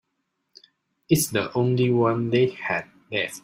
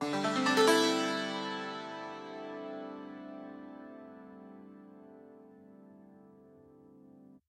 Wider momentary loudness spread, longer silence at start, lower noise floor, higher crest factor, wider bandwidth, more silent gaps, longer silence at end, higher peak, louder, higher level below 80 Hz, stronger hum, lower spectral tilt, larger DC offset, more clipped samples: second, 7 LU vs 28 LU; first, 1.1 s vs 0 s; first, -77 dBFS vs -58 dBFS; about the same, 18 dB vs 22 dB; about the same, 16 kHz vs 16 kHz; neither; about the same, 0.05 s vs 0.1 s; first, -6 dBFS vs -14 dBFS; first, -23 LUFS vs -32 LUFS; first, -60 dBFS vs -84 dBFS; neither; first, -5 dB/octave vs -3.5 dB/octave; neither; neither